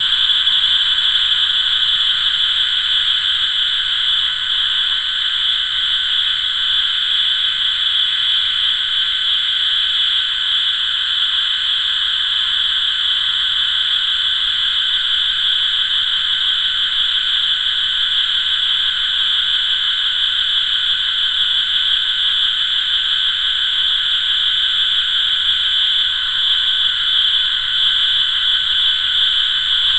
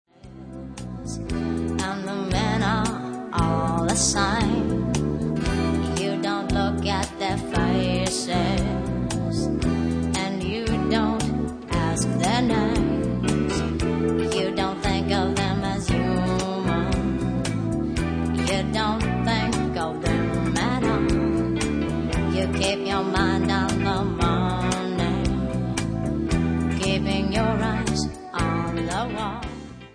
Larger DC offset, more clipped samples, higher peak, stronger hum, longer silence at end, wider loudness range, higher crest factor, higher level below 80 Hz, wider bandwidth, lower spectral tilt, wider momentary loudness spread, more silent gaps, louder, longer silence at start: first, 0.6% vs under 0.1%; neither; first, -4 dBFS vs -8 dBFS; neither; about the same, 0 s vs 0.05 s; about the same, 1 LU vs 1 LU; about the same, 12 dB vs 16 dB; second, -46 dBFS vs -34 dBFS; second, 9.2 kHz vs 10.5 kHz; second, 2 dB/octave vs -5.5 dB/octave; second, 2 LU vs 5 LU; neither; first, -13 LUFS vs -24 LUFS; second, 0 s vs 0.25 s